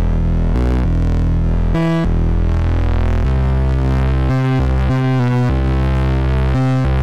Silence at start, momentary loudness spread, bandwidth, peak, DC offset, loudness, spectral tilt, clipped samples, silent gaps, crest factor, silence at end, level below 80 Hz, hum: 0 s; 2 LU; 7.6 kHz; -6 dBFS; under 0.1%; -16 LUFS; -8.5 dB/octave; under 0.1%; none; 8 dB; 0 s; -18 dBFS; none